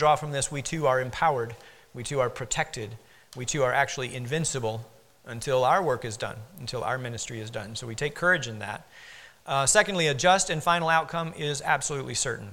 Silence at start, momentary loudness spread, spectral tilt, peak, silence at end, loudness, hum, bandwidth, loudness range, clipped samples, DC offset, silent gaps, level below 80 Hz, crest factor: 0 s; 16 LU; -3 dB/octave; -6 dBFS; 0 s; -27 LUFS; none; 17.5 kHz; 5 LU; under 0.1%; under 0.1%; none; -54 dBFS; 22 dB